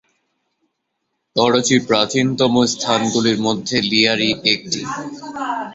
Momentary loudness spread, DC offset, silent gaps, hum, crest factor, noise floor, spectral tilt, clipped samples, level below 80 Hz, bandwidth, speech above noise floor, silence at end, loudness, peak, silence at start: 10 LU; under 0.1%; none; none; 18 dB; -74 dBFS; -3.5 dB/octave; under 0.1%; -56 dBFS; 8.4 kHz; 57 dB; 0 s; -17 LUFS; 0 dBFS; 1.35 s